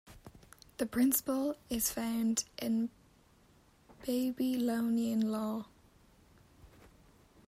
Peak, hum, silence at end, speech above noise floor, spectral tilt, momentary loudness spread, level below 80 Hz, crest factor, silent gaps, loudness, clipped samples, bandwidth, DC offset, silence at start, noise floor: -16 dBFS; none; 0.8 s; 32 dB; -4 dB/octave; 11 LU; -64 dBFS; 20 dB; none; -34 LUFS; under 0.1%; 16 kHz; under 0.1%; 0.05 s; -65 dBFS